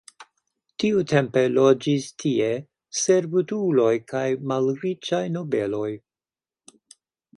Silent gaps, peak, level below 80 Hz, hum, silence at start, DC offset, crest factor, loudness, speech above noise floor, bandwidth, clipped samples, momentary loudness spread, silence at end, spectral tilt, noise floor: none; -4 dBFS; -66 dBFS; none; 0.2 s; under 0.1%; 20 dB; -23 LUFS; over 68 dB; 11 kHz; under 0.1%; 10 LU; 1.4 s; -5.5 dB/octave; under -90 dBFS